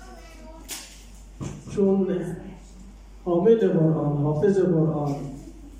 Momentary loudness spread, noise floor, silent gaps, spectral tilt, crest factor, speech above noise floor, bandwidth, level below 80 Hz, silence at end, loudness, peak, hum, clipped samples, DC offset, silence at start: 24 LU; -44 dBFS; none; -8 dB/octave; 18 dB; 23 dB; 16 kHz; -46 dBFS; 0 s; -23 LUFS; -6 dBFS; none; under 0.1%; under 0.1%; 0 s